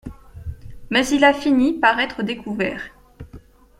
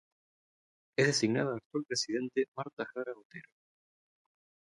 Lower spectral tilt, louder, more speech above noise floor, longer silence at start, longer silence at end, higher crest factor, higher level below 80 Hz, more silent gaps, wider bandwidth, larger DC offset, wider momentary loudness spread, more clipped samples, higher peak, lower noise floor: about the same, -4.5 dB/octave vs -4 dB/octave; first, -19 LUFS vs -33 LUFS; second, 26 dB vs over 56 dB; second, 0.05 s vs 1 s; second, 0.4 s vs 1.3 s; about the same, 20 dB vs 22 dB; first, -44 dBFS vs -78 dBFS; second, none vs 1.66-1.70 s, 2.48-2.52 s, 2.73-2.77 s, 3.25-3.30 s; first, 14.5 kHz vs 11.5 kHz; neither; first, 21 LU vs 16 LU; neither; first, -2 dBFS vs -14 dBFS; second, -44 dBFS vs under -90 dBFS